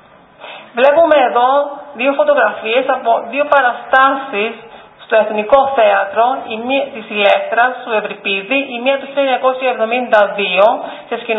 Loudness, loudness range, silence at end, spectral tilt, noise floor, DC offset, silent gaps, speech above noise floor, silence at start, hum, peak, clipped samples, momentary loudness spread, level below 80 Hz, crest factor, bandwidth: -14 LUFS; 2 LU; 0 s; -5.5 dB/octave; -37 dBFS; under 0.1%; none; 24 dB; 0.4 s; none; 0 dBFS; under 0.1%; 9 LU; -58 dBFS; 14 dB; 4.7 kHz